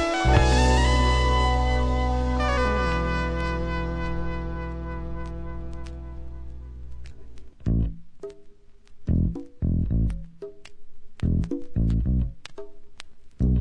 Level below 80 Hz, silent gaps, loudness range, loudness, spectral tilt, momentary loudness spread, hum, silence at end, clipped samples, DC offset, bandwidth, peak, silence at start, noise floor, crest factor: -28 dBFS; none; 12 LU; -25 LUFS; -6 dB/octave; 22 LU; none; 0 s; under 0.1%; under 0.1%; 10 kHz; -6 dBFS; 0 s; -45 dBFS; 20 dB